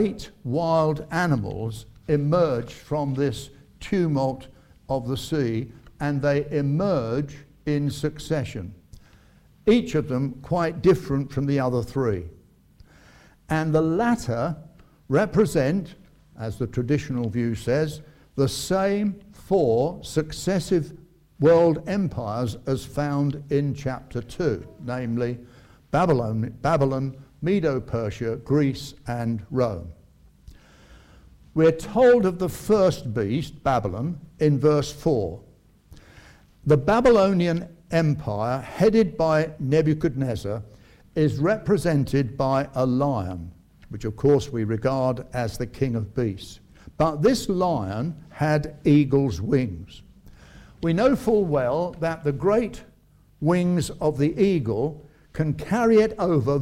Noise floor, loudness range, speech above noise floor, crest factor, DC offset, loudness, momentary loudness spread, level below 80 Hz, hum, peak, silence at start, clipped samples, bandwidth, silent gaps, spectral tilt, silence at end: -56 dBFS; 4 LU; 33 dB; 18 dB; under 0.1%; -24 LUFS; 12 LU; -48 dBFS; none; -6 dBFS; 0 s; under 0.1%; 16 kHz; none; -7 dB/octave; 0 s